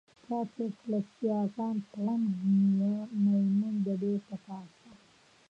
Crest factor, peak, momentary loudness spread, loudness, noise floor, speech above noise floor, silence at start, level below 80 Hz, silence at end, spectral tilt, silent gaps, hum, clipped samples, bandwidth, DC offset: 12 dB; -20 dBFS; 11 LU; -31 LUFS; -62 dBFS; 32 dB; 0.3 s; -78 dBFS; 0.55 s; -10 dB/octave; none; none; under 0.1%; 6 kHz; under 0.1%